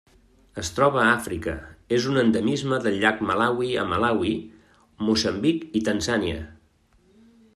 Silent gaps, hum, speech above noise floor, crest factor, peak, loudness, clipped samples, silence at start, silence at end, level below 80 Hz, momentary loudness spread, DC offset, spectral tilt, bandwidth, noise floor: none; none; 38 dB; 20 dB; -4 dBFS; -23 LUFS; under 0.1%; 0.55 s; 1 s; -50 dBFS; 11 LU; under 0.1%; -5 dB/octave; 13.5 kHz; -61 dBFS